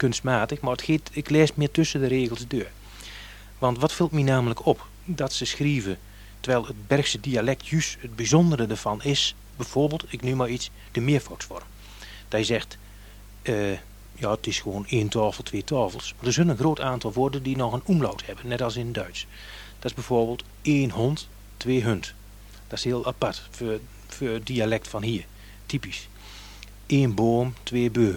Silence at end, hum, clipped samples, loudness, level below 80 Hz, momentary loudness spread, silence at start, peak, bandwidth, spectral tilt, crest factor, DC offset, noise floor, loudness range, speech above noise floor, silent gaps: 0 s; 50 Hz at -45 dBFS; under 0.1%; -26 LUFS; -46 dBFS; 16 LU; 0 s; -6 dBFS; 19.5 kHz; -5.5 dB/octave; 20 dB; under 0.1%; -45 dBFS; 5 LU; 20 dB; none